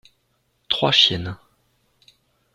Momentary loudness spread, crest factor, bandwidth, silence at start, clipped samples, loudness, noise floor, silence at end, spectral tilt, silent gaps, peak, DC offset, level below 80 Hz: 20 LU; 24 dB; 14 kHz; 0.7 s; under 0.1%; -17 LUFS; -68 dBFS; 1.2 s; -3.5 dB/octave; none; 0 dBFS; under 0.1%; -56 dBFS